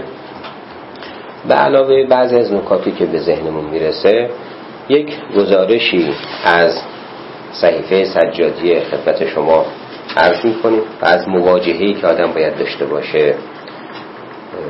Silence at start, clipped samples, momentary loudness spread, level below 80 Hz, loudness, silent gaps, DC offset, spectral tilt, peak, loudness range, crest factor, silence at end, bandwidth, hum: 0 s; under 0.1%; 19 LU; -52 dBFS; -14 LUFS; none; under 0.1%; -7.5 dB/octave; 0 dBFS; 2 LU; 14 dB; 0 s; 5.8 kHz; none